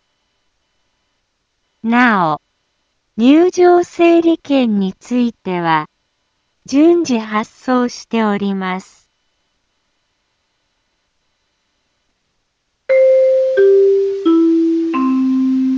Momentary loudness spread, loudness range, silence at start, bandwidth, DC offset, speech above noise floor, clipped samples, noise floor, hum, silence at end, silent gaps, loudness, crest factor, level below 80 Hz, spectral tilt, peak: 10 LU; 8 LU; 1.85 s; 7.6 kHz; under 0.1%; 54 dB; under 0.1%; -68 dBFS; none; 0 s; none; -14 LUFS; 16 dB; -62 dBFS; -6 dB/octave; 0 dBFS